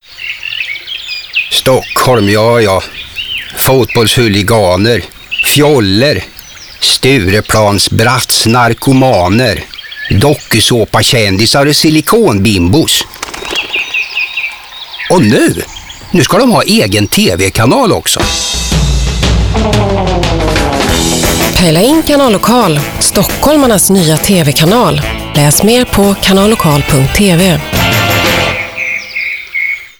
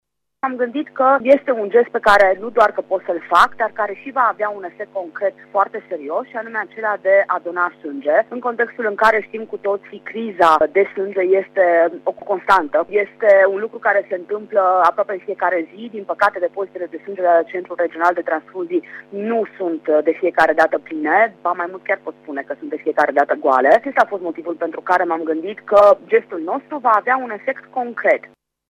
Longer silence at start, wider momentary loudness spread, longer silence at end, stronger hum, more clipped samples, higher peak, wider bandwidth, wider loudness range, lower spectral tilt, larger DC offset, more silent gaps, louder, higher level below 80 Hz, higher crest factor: second, 0.1 s vs 0.45 s; about the same, 10 LU vs 12 LU; second, 0.1 s vs 0.45 s; second, none vs 50 Hz at -65 dBFS; neither; about the same, 0 dBFS vs -2 dBFS; first, over 20 kHz vs 11.5 kHz; about the same, 3 LU vs 4 LU; about the same, -4 dB/octave vs -5 dB/octave; neither; neither; first, -9 LUFS vs -18 LUFS; first, -24 dBFS vs -58 dBFS; second, 10 dB vs 16 dB